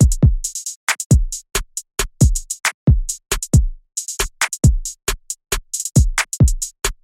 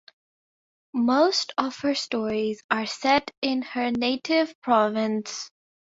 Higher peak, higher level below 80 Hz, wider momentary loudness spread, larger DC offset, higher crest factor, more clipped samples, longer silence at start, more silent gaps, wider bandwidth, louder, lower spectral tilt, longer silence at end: first, -2 dBFS vs -6 dBFS; first, -22 dBFS vs -66 dBFS; about the same, 8 LU vs 7 LU; neither; about the same, 16 dB vs 20 dB; neither; second, 0 s vs 0.95 s; first, 0.76-0.87 s, 1.06-1.10 s, 2.74-2.87 s vs 2.64-2.69 s, 3.37-3.42 s, 4.55-4.62 s; first, 16.5 kHz vs 7.8 kHz; first, -19 LUFS vs -25 LUFS; about the same, -4 dB/octave vs -3.5 dB/octave; second, 0.1 s vs 0.45 s